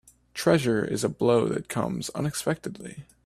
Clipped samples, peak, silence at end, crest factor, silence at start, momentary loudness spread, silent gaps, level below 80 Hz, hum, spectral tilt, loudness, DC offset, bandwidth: under 0.1%; -6 dBFS; 0.25 s; 20 dB; 0.35 s; 15 LU; none; -58 dBFS; none; -5.5 dB/octave; -26 LUFS; under 0.1%; 15.5 kHz